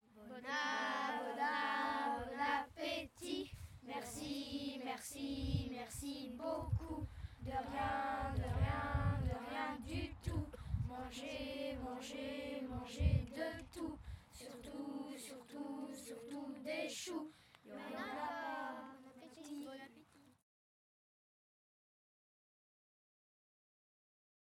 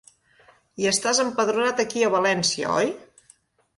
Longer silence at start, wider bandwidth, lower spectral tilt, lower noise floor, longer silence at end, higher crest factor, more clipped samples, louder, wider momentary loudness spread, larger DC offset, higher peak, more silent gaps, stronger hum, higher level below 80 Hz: second, 0.15 s vs 0.8 s; first, 16 kHz vs 11.5 kHz; first, -5.5 dB/octave vs -2.5 dB/octave; first, -66 dBFS vs -59 dBFS; first, 4.25 s vs 0.8 s; first, 22 dB vs 16 dB; neither; second, -43 LUFS vs -22 LUFS; first, 13 LU vs 5 LU; neither; second, -22 dBFS vs -8 dBFS; neither; neither; first, -54 dBFS vs -66 dBFS